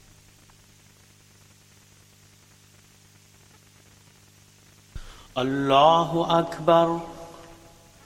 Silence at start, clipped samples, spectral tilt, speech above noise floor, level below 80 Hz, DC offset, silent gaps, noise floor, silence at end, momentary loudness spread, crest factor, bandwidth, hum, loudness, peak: 4.95 s; under 0.1%; -5.5 dB/octave; 34 dB; -54 dBFS; under 0.1%; none; -55 dBFS; 0.65 s; 27 LU; 22 dB; 15.5 kHz; 50 Hz at -60 dBFS; -21 LUFS; -4 dBFS